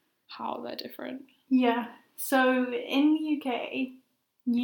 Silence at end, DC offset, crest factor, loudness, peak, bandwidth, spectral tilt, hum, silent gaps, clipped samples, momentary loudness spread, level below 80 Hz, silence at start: 0 s; under 0.1%; 18 dB; -28 LUFS; -12 dBFS; 19.5 kHz; -3.5 dB/octave; none; none; under 0.1%; 15 LU; -86 dBFS; 0.3 s